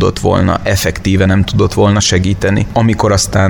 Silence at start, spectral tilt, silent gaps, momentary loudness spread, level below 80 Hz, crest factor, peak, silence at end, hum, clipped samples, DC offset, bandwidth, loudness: 0 s; -5 dB/octave; none; 3 LU; -28 dBFS; 10 dB; 0 dBFS; 0 s; none; under 0.1%; under 0.1%; 17.5 kHz; -12 LUFS